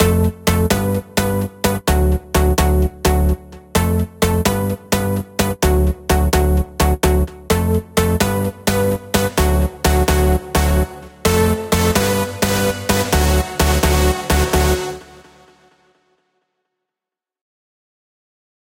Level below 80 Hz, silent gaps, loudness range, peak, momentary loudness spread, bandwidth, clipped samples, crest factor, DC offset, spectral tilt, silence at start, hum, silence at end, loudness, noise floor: -22 dBFS; none; 2 LU; 0 dBFS; 4 LU; 17 kHz; under 0.1%; 16 dB; under 0.1%; -5 dB/octave; 0 s; none; 3.7 s; -17 LUFS; -87 dBFS